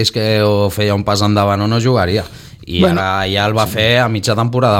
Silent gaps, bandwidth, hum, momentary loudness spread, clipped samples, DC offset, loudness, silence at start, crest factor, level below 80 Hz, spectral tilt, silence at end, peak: none; 17 kHz; none; 4 LU; under 0.1%; under 0.1%; -14 LUFS; 0 s; 12 dB; -40 dBFS; -5.5 dB/octave; 0 s; 0 dBFS